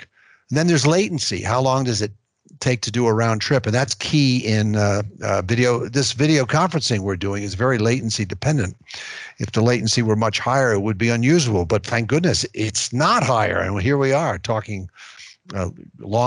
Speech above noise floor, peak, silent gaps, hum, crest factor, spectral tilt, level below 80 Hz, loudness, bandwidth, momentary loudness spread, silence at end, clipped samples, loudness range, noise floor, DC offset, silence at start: 29 dB; -6 dBFS; none; none; 14 dB; -5 dB/octave; -50 dBFS; -20 LUFS; 11 kHz; 11 LU; 0 s; under 0.1%; 2 LU; -49 dBFS; under 0.1%; 0 s